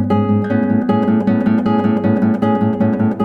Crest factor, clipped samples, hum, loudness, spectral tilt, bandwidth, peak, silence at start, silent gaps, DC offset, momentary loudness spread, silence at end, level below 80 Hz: 10 dB; under 0.1%; none; -15 LUFS; -10 dB/octave; 4.9 kHz; -4 dBFS; 0 s; none; under 0.1%; 1 LU; 0 s; -50 dBFS